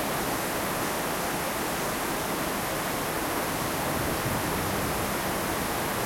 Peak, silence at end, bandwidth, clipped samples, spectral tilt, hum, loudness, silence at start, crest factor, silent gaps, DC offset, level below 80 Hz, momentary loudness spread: -16 dBFS; 0 s; 16.5 kHz; under 0.1%; -3.5 dB/octave; none; -28 LUFS; 0 s; 14 dB; none; under 0.1%; -46 dBFS; 1 LU